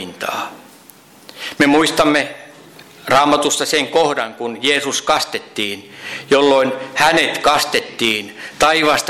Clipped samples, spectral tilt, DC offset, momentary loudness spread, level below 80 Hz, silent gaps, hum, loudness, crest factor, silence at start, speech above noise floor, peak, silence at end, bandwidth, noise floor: under 0.1%; -2.5 dB/octave; under 0.1%; 16 LU; -50 dBFS; none; none; -15 LUFS; 14 dB; 0 s; 29 dB; -4 dBFS; 0 s; 16.5 kHz; -44 dBFS